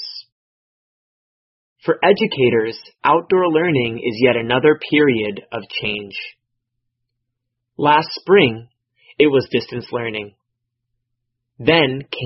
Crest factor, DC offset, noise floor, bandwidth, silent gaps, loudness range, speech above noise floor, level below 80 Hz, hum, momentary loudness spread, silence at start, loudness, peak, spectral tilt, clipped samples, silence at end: 18 dB; under 0.1%; -77 dBFS; 5.8 kHz; 0.32-1.76 s; 5 LU; 60 dB; -56 dBFS; none; 14 LU; 0 s; -17 LUFS; 0 dBFS; -9.5 dB/octave; under 0.1%; 0 s